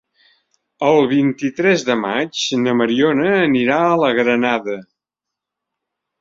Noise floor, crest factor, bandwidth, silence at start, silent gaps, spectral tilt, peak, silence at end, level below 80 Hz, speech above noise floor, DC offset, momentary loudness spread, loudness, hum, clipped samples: -84 dBFS; 16 dB; 7.8 kHz; 0.8 s; none; -5 dB/octave; -2 dBFS; 1.4 s; -60 dBFS; 68 dB; under 0.1%; 5 LU; -16 LUFS; none; under 0.1%